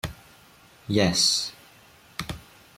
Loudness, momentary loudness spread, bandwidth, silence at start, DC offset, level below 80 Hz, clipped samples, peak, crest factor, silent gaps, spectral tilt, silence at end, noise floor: -23 LUFS; 20 LU; 16.5 kHz; 0.05 s; under 0.1%; -52 dBFS; under 0.1%; -8 dBFS; 22 dB; none; -3 dB/octave; 0.4 s; -54 dBFS